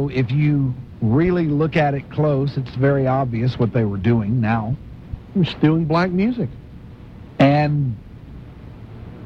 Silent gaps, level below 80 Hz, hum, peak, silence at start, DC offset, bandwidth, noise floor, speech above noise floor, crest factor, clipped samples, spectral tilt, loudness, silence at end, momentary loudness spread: none; -42 dBFS; none; -2 dBFS; 0 s; under 0.1%; 6.2 kHz; -38 dBFS; 20 dB; 16 dB; under 0.1%; -9.5 dB/octave; -19 LUFS; 0 s; 22 LU